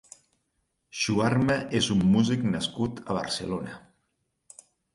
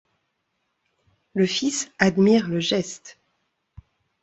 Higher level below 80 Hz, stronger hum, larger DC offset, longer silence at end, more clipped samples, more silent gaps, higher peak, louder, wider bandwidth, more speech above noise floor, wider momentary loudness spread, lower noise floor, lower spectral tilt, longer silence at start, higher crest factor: first, -54 dBFS vs -60 dBFS; neither; neither; about the same, 1.15 s vs 1.1 s; neither; neither; second, -10 dBFS vs -4 dBFS; second, -26 LUFS vs -21 LUFS; first, 11.5 kHz vs 8.2 kHz; about the same, 51 dB vs 54 dB; about the same, 12 LU vs 14 LU; about the same, -77 dBFS vs -75 dBFS; about the same, -5 dB/octave vs -4.5 dB/octave; second, 0.95 s vs 1.35 s; about the same, 18 dB vs 22 dB